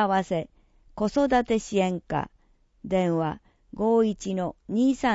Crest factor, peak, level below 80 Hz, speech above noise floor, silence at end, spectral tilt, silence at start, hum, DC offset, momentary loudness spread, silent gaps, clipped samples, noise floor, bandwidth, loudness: 18 dB; -8 dBFS; -52 dBFS; 36 dB; 0 s; -6.5 dB/octave; 0 s; none; under 0.1%; 15 LU; none; under 0.1%; -61 dBFS; 8 kHz; -26 LUFS